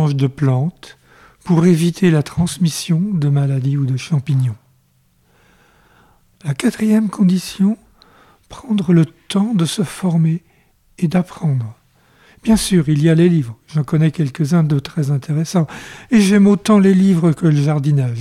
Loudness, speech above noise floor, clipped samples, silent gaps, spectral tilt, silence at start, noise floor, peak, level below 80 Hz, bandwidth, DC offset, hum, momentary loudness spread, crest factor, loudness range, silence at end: -16 LUFS; 43 dB; under 0.1%; none; -7 dB/octave; 0 s; -58 dBFS; -4 dBFS; -46 dBFS; 14 kHz; under 0.1%; none; 10 LU; 12 dB; 6 LU; 0 s